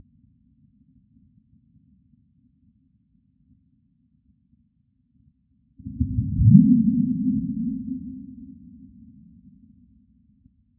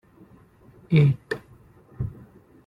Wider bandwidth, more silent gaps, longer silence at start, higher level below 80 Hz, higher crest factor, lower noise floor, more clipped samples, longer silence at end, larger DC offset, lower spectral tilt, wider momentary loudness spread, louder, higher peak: second, 0.4 kHz vs 5.4 kHz; neither; first, 5.85 s vs 0.9 s; first, -42 dBFS vs -50 dBFS; first, 26 dB vs 20 dB; first, -67 dBFS vs -53 dBFS; neither; first, 2.3 s vs 0.55 s; neither; first, -16.5 dB/octave vs -9 dB/octave; first, 29 LU vs 15 LU; first, -20 LUFS vs -24 LUFS; first, 0 dBFS vs -6 dBFS